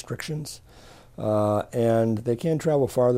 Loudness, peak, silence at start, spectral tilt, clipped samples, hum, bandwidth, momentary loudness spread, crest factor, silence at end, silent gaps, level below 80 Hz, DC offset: -25 LUFS; -10 dBFS; 0.05 s; -7 dB/octave; under 0.1%; none; 16 kHz; 11 LU; 14 dB; 0 s; none; -54 dBFS; under 0.1%